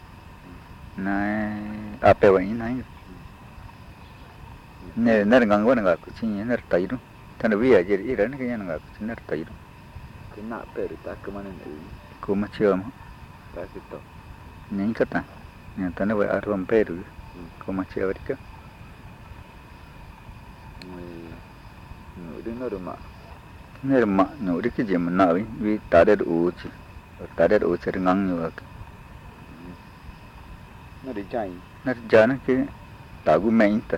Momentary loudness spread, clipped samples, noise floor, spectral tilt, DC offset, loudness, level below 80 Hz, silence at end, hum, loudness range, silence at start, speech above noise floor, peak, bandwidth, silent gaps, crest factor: 26 LU; under 0.1%; -45 dBFS; -8 dB/octave; under 0.1%; -23 LUFS; -48 dBFS; 0 s; none; 15 LU; 0 s; 22 dB; -4 dBFS; 15.5 kHz; none; 20 dB